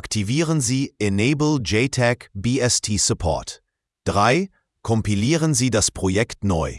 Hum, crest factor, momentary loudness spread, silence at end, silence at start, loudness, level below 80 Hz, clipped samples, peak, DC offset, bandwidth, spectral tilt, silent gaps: none; 18 dB; 7 LU; 0 s; 0.05 s; -20 LUFS; -42 dBFS; under 0.1%; -2 dBFS; under 0.1%; 12 kHz; -4.5 dB/octave; none